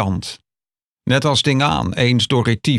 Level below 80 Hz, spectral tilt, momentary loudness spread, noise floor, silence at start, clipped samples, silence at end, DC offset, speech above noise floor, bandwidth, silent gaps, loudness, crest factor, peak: -42 dBFS; -5 dB/octave; 11 LU; under -90 dBFS; 0 s; under 0.1%; 0 s; under 0.1%; over 73 dB; 12.5 kHz; 0.83-0.96 s; -17 LUFS; 14 dB; -4 dBFS